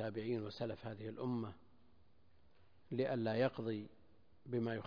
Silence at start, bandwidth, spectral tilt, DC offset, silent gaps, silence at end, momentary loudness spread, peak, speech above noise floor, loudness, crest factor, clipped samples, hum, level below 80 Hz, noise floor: 0 s; 5.2 kHz; -6 dB/octave; under 0.1%; none; 0 s; 10 LU; -22 dBFS; 32 dB; -42 LUFS; 20 dB; under 0.1%; none; -74 dBFS; -72 dBFS